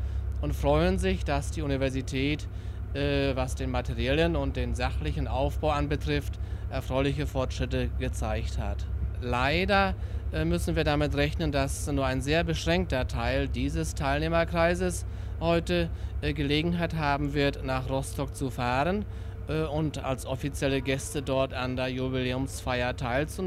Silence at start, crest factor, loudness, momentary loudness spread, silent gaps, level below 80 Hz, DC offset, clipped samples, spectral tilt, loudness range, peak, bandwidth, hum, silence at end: 0 s; 18 dB; -29 LUFS; 7 LU; none; -36 dBFS; under 0.1%; under 0.1%; -6 dB/octave; 3 LU; -10 dBFS; 14.5 kHz; none; 0 s